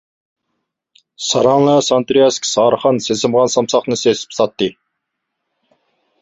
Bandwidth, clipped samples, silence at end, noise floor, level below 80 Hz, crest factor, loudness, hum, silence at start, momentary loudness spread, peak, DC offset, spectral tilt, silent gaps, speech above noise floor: 8 kHz; under 0.1%; 1.5 s; -75 dBFS; -56 dBFS; 16 dB; -14 LUFS; none; 1.2 s; 6 LU; 0 dBFS; under 0.1%; -4 dB/octave; none; 61 dB